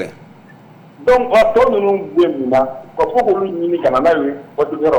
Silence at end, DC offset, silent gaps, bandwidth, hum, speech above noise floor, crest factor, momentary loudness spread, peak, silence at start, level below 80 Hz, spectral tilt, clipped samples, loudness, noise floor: 0 s; under 0.1%; none; 19 kHz; none; 27 dB; 10 dB; 9 LU; -6 dBFS; 0 s; -44 dBFS; -6.5 dB/octave; under 0.1%; -15 LUFS; -41 dBFS